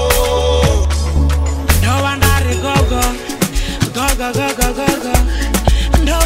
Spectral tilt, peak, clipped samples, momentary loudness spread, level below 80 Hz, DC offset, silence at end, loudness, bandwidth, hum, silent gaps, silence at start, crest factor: -4.5 dB/octave; 0 dBFS; under 0.1%; 5 LU; -16 dBFS; under 0.1%; 0 s; -15 LUFS; 16.5 kHz; none; none; 0 s; 14 dB